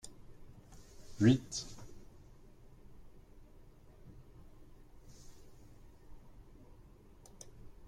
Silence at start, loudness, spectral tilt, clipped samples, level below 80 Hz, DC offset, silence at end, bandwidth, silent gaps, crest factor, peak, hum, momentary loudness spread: 0.05 s; -33 LUFS; -6 dB/octave; under 0.1%; -58 dBFS; under 0.1%; 0 s; 14.5 kHz; none; 26 dB; -14 dBFS; none; 31 LU